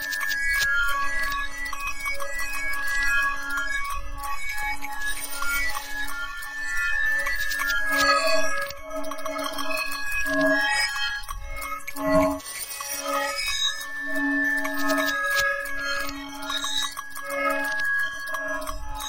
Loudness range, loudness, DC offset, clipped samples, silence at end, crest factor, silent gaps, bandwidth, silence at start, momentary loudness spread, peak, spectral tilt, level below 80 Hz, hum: 3 LU; -25 LUFS; under 0.1%; under 0.1%; 0 s; 18 dB; none; 17 kHz; 0 s; 10 LU; -8 dBFS; -2 dB/octave; -40 dBFS; none